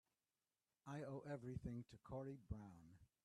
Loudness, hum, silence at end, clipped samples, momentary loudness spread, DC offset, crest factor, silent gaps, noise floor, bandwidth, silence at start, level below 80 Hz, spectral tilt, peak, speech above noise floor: -54 LUFS; none; 0.2 s; under 0.1%; 10 LU; under 0.1%; 18 dB; none; under -90 dBFS; 12.5 kHz; 0.85 s; -68 dBFS; -8 dB/octave; -38 dBFS; over 37 dB